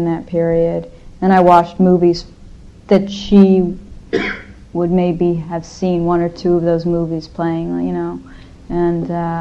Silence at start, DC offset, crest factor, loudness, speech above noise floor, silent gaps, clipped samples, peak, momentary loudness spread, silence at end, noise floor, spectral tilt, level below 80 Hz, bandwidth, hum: 0 s; under 0.1%; 16 dB; -16 LUFS; 23 dB; none; under 0.1%; 0 dBFS; 13 LU; 0 s; -37 dBFS; -8 dB/octave; -38 dBFS; 7.6 kHz; none